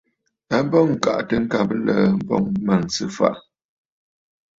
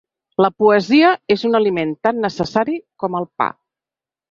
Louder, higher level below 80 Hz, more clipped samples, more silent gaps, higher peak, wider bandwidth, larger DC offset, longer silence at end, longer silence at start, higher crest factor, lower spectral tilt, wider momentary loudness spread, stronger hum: second, -20 LUFS vs -17 LUFS; about the same, -52 dBFS vs -56 dBFS; neither; neither; about the same, -2 dBFS vs -2 dBFS; about the same, 7.8 kHz vs 7.4 kHz; neither; first, 1.2 s vs 0.85 s; about the same, 0.5 s vs 0.4 s; about the same, 18 dB vs 16 dB; about the same, -6 dB/octave vs -6 dB/octave; second, 5 LU vs 10 LU; neither